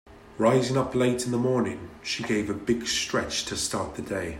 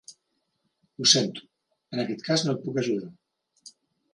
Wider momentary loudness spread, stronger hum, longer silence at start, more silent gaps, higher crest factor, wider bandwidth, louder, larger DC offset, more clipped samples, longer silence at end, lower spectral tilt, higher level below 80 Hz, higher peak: second, 9 LU vs 16 LU; neither; about the same, 0.05 s vs 0.1 s; neither; second, 18 dB vs 26 dB; first, 16 kHz vs 11.5 kHz; about the same, -26 LUFS vs -25 LUFS; neither; neither; second, 0 s vs 0.45 s; first, -4.5 dB/octave vs -3 dB/octave; first, -52 dBFS vs -74 dBFS; second, -8 dBFS vs -4 dBFS